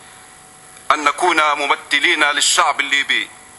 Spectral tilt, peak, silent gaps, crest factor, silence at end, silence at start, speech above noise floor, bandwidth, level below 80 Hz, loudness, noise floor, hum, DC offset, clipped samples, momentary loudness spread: 0.5 dB/octave; 0 dBFS; none; 18 dB; 0.25 s; 0.9 s; 26 dB; 15 kHz; -60 dBFS; -15 LUFS; -42 dBFS; none; under 0.1%; under 0.1%; 5 LU